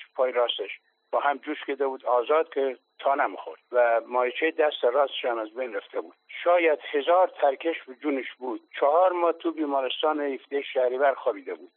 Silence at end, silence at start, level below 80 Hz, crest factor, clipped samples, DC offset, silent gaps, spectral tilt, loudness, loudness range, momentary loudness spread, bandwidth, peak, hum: 0.1 s; 0 s; under -90 dBFS; 16 dB; under 0.1%; under 0.1%; none; 2 dB/octave; -26 LUFS; 2 LU; 11 LU; 4.2 kHz; -10 dBFS; none